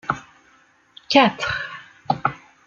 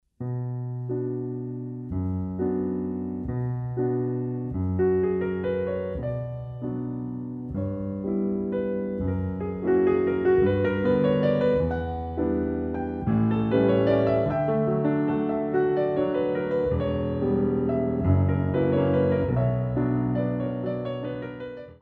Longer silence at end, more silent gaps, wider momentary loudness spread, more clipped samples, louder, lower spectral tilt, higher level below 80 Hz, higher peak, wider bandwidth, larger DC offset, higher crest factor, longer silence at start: first, 0.3 s vs 0.05 s; neither; first, 15 LU vs 10 LU; neither; first, -21 LUFS vs -26 LUFS; second, -4.5 dB/octave vs -11 dB/octave; second, -56 dBFS vs -46 dBFS; first, -2 dBFS vs -10 dBFS; first, 7.6 kHz vs 5 kHz; neither; first, 22 dB vs 16 dB; about the same, 0.1 s vs 0.2 s